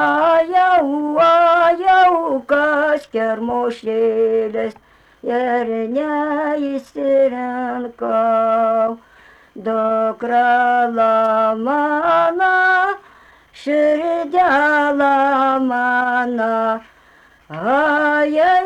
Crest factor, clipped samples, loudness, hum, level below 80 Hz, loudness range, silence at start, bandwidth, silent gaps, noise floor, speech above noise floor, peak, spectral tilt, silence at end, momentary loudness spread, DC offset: 12 dB; under 0.1%; -16 LUFS; none; -58 dBFS; 5 LU; 0 s; 9 kHz; none; -50 dBFS; 33 dB; -4 dBFS; -5.5 dB/octave; 0 s; 9 LU; under 0.1%